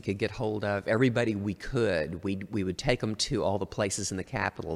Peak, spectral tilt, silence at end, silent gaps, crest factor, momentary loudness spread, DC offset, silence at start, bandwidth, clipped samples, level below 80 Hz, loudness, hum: -10 dBFS; -5 dB/octave; 0 s; none; 20 dB; 7 LU; under 0.1%; 0.05 s; 15 kHz; under 0.1%; -50 dBFS; -30 LUFS; none